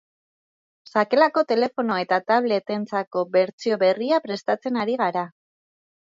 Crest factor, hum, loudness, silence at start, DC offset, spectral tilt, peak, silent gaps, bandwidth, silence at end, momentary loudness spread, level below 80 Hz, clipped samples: 18 dB; none; -22 LUFS; 0.95 s; under 0.1%; -6 dB/octave; -4 dBFS; 3.07-3.11 s, 3.53-3.58 s; 7.6 kHz; 0.85 s; 8 LU; -74 dBFS; under 0.1%